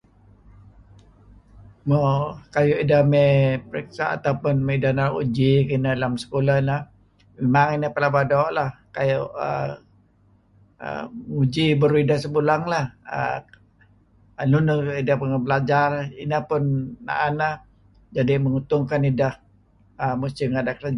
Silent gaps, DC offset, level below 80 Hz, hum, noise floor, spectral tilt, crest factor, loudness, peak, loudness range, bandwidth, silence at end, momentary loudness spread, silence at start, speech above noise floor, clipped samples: none; under 0.1%; -52 dBFS; none; -58 dBFS; -8 dB/octave; 16 dB; -22 LUFS; -6 dBFS; 4 LU; 10.5 kHz; 0 s; 10 LU; 1.55 s; 37 dB; under 0.1%